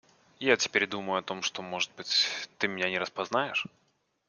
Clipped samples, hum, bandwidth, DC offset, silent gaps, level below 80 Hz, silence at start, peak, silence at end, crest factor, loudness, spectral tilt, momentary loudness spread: under 0.1%; none; 10.5 kHz; under 0.1%; none; -74 dBFS; 0.4 s; -6 dBFS; 0.6 s; 26 dB; -29 LUFS; -2 dB/octave; 7 LU